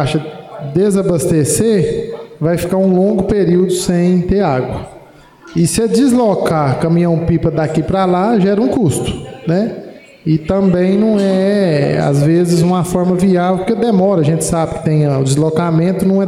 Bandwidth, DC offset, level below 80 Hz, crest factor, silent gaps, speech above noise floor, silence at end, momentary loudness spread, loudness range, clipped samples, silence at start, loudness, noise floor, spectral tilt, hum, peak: 15.5 kHz; under 0.1%; -38 dBFS; 10 dB; none; 28 dB; 0 s; 8 LU; 2 LU; under 0.1%; 0 s; -13 LUFS; -40 dBFS; -6.5 dB/octave; none; -4 dBFS